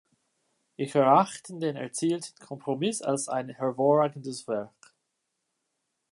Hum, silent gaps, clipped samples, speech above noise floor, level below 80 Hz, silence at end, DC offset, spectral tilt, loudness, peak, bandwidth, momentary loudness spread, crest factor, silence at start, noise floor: none; none; under 0.1%; 53 dB; -80 dBFS; 1.45 s; under 0.1%; -5 dB/octave; -27 LUFS; -8 dBFS; 11.5 kHz; 14 LU; 22 dB; 0.8 s; -80 dBFS